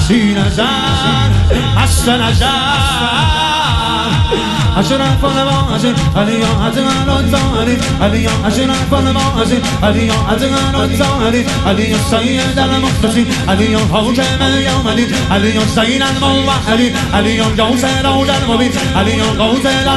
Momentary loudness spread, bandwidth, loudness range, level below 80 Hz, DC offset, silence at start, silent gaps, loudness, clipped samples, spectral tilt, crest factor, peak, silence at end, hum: 2 LU; 13.5 kHz; 1 LU; -24 dBFS; under 0.1%; 0 s; none; -12 LUFS; under 0.1%; -5 dB/octave; 12 dB; 0 dBFS; 0 s; none